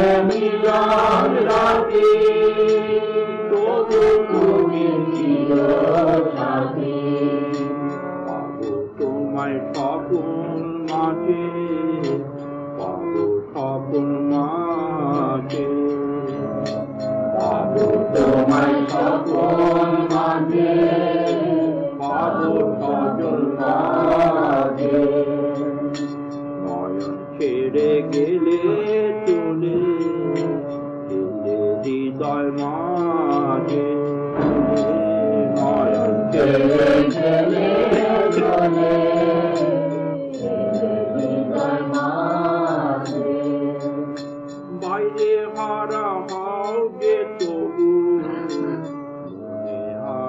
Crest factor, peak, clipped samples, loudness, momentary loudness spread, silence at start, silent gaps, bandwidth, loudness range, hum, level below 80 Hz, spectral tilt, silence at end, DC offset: 12 dB; -6 dBFS; under 0.1%; -20 LUFS; 10 LU; 0 s; none; 7.8 kHz; 6 LU; none; -52 dBFS; -7.5 dB/octave; 0 s; under 0.1%